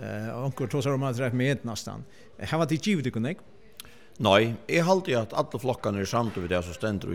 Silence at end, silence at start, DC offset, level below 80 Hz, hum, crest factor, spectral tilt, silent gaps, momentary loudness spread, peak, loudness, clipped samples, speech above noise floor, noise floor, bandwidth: 0 s; 0 s; 0.3%; -60 dBFS; none; 22 dB; -5.5 dB/octave; none; 15 LU; -6 dBFS; -27 LUFS; under 0.1%; 23 dB; -50 dBFS; 17 kHz